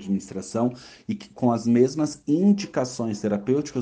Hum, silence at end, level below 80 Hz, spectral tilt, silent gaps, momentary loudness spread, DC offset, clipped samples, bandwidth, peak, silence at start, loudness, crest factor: none; 0 s; -62 dBFS; -6.5 dB/octave; none; 12 LU; under 0.1%; under 0.1%; 9.6 kHz; -6 dBFS; 0 s; -24 LUFS; 16 dB